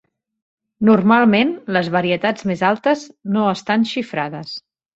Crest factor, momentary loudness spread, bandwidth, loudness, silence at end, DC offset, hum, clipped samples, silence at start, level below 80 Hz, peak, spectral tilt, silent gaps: 16 dB; 12 LU; 7.8 kHz; -17 LUFS; 0.35 s; under 0.1%; none; under 0.1%; 0.8 s; -60 dBFS; -2 dBFS; -6.5 dB/octave; none